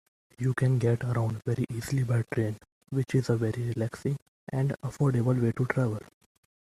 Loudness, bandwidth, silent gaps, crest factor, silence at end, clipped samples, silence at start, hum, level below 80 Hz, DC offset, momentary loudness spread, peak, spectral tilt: -29 LUFS; 13 kHz; 2.72-2.81 s, 4.22-4.47 s; 18 dB; 0.65 s; under 0.1%; 0.4 s; none; -58 dBFS; under 0.1%; 8 LU; -10 dBFS; -8 dB/octave